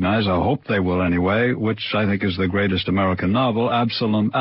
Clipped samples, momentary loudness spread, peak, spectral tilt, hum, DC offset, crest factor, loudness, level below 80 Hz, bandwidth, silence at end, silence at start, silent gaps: under 0.1%; 2 LU; -8 dBFS; -11 dB/octave; none; under 0.1%; 12 dB; -20 LUFS; -38 dBFS; 5.8 kHz; 0 s; 0 s; none